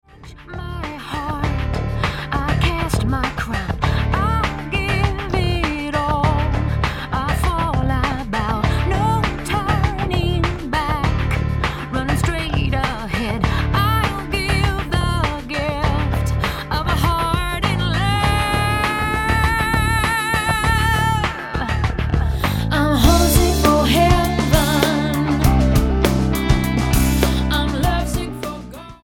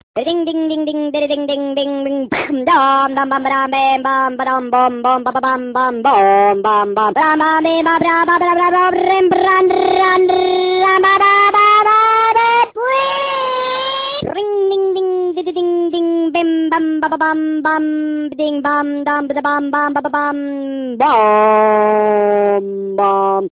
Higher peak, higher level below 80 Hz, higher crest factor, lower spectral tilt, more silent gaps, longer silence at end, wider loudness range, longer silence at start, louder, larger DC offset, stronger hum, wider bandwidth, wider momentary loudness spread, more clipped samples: about the same, 0 dBFS vs -2 dBFS; first, -24 dBFS vs -56 dBFS; first, 18 dB vs 12 dB; second, -5.5 dB/octave vs -8 dB/octave; neither; about the same, 0.1 s vs 0.1 s; about the same, 4 LU vs 6 LU; about the same, 0.15 s vs 0.15 s; second, -19 LUFS vs -14 LUFS; neither; neither; first, 17.5 kHz vs 4 kHz; about the same, 7 LU vs 8 LU; neither